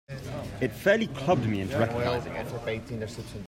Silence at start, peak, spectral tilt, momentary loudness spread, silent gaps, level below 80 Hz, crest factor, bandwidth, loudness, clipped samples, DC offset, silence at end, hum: 0.1 s; -8 dBFS; -6.5 dB/octave; 12 LU; none; -52 dBFS; 20 dB; 16 kHz; -29 LUFS; under 0.1%; under 0.1%; 0 s; none